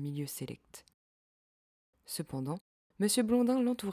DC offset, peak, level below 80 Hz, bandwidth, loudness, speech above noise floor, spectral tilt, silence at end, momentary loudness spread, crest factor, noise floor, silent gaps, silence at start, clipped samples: under 0.1%; -18 dBFS; -70 dBFS; 16 kHz; -33 LUFS; over 57 dB; -5 dB/octave; 0 s; 15 LU; 16 dB; under -90 dBFS; 0.94-1.93 s, 2.61-2.90 s; 0 s; under 0.1%